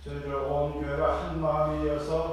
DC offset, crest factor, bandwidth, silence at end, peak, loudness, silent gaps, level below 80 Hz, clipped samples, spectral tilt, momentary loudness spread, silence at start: under 0.1%; 16 dB; 12 kHz; 0 s; -14 dBFS; -29 LUFS; none; -40 dBFS; under 0.1%; -7.5 dB/octave; 3 LU; 0 s